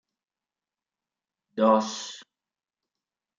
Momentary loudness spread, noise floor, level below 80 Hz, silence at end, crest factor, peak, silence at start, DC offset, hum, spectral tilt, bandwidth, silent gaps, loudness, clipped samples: 18 LU; under -90 dBFS; -82 dBFS; 1.15 s; 22 dB; -8 dBFS; 1.55 s; under 0.1%; none; -4.5 dB/octave; 7.6 kHz; none; -25 LUFS; under 0.1%